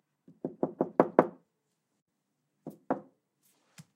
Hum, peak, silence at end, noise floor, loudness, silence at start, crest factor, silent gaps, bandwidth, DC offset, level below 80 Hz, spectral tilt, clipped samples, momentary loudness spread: none; -4 dBFS; 0.15 s; -81 dBFS; -31 LUFS; 0.45 s; 30 dB; 2.02-2.06 s; 15 kHz; under 0.1%; -82 dBFS; -8.5 dB/octave; under 0.1%; 24 LU